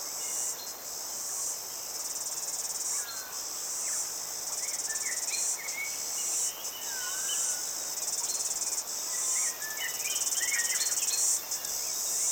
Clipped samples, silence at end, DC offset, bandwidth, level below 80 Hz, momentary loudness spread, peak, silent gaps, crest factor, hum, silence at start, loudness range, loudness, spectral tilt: under 0.1%; 0 s; under 0.1%; 19 kHz; -72 dBFS; 7 LU; -14 dBFS; none; 20 dB; none; 0 s; 4 LU; -30 LUFS; 2.5 dB/octave